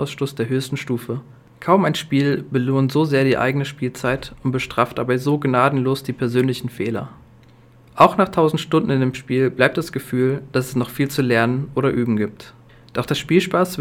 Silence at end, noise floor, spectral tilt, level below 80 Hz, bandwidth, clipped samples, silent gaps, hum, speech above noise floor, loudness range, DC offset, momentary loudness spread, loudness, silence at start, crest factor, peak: 0 s; -48 dBFS; -6.5 dB/octave; -52 dBFS; 16.5 kHz; under 0.1%; none; none; 29 dB; 2 LU; under 0.1%; 9 LU; -20 LUFS; 0 s; 20 dB; 0 dBFS